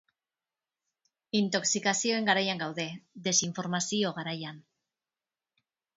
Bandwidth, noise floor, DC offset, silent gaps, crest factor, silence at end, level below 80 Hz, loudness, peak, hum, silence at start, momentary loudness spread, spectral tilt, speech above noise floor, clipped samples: 8 kHz; under -90 dBFS; under 0.1%; none; 24 dB; 1.35 s; -78 dBFS; -29 LUFS; -10 dBFS; none; 1.35 s; 10 LU; -2.5 dB/octave; over 60 dB; under 0.1%